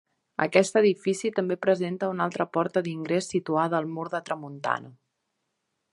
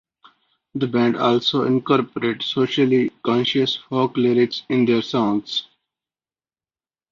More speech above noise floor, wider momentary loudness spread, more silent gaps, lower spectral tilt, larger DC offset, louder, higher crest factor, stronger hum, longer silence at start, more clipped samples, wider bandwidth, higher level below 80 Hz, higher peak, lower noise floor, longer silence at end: second, 53 dB vs over 71 dB; first, 10 LU vs 6 LU; neither; about the same, -5.5 dB/octave vs -6.5 dB/octave; neither; second, -26 LUFS vs -20 LUFS; first, 24 dB vs 18 dB; neither; second, 0.4 s vs 0.75 s; neither; first, 11.5 kHz vs 7.2 kHz; second, -74 dBFS vs -64 dBFS; about the same, -4 dBFS vs -4 dBFS; second, -79 dBFS vs under -90 dBFS; second, 1 s vs 1.5 s